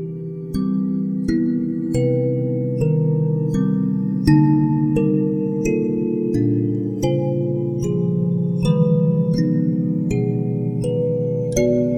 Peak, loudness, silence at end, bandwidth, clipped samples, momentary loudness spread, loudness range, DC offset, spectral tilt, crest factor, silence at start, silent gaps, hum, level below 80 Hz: -2 dBFS; -20 LUFS; 0 s; 12.5 kHz; under 0.1%; 5 LU; 2 LU; under 0.1%; -8.5 dB/octave; 16 dB; 0 s; none; none; -42 dBFS